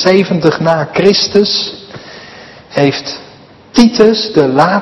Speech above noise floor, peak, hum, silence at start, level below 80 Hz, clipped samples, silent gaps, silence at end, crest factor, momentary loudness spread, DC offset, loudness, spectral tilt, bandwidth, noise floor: 28 dB; 0 dBFS; none; 0 s; -46 dBFS; 1%; none; 0 s; 12 dB; 20 LU; under 0.1%; -11 LUFS; -5 dB/octave; 12 kHz; -38 dBFS